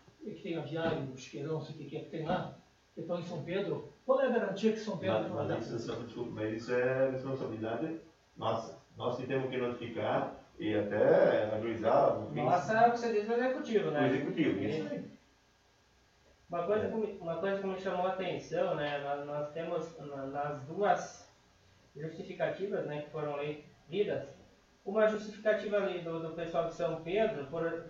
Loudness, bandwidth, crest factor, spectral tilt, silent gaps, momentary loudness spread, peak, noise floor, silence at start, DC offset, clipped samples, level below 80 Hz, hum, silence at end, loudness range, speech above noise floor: -34 LUFS; 7.6 kHz; 20 dB; -6.5 dB/octave; none; 12 LU; -14 dBFS; -68 dBFS; 0.2 s; under 0.1%; under 0.1%; -68 dBFS; none; 0 s; 8 LU; 34 dB